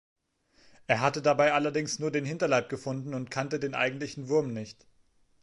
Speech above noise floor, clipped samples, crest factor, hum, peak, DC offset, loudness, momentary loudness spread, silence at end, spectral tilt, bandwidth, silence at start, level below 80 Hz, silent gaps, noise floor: 37 dB; under 0.1%; 22 dB; none; -8 dBFS; under 0.1%; -29 LUFS; 12 LU; 0.7 s; -5 dB/octave; 11.5 kHz; 0.9 s; -70 dBFS; none; -66 dBFS